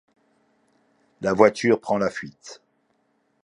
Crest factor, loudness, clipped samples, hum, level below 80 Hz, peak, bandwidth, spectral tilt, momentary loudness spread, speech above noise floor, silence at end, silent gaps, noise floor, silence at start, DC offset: 24 dB; -21 LUFS; under 0.1%; none; -62 dBFS; -2 dBFS; 10.5 kHz; -5.5 dB/octave; 23 LU; 47 dB; 0.9 s; none; -69 dBFS; 1.2 s; under 0.1%